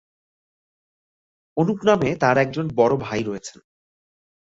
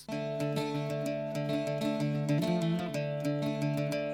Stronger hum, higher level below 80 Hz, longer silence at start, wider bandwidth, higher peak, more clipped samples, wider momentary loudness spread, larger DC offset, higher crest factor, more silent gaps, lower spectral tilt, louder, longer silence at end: neither; first, -56 dBFS vs -66 dBFS; first, 1.55 s vs 0 s; second, 8 kHz vs 16.5 kHz; first, -4 dBFS vs -18 dBFS; neither; first, 12 LU vs 4 LU; neither; first, 20 dB vs 14 dB; neither; about the same, -6.5 dB/octave vs -7 dB/octave; first, -21 LUFS vs -33 LUFS; first, 1 s vs 0 s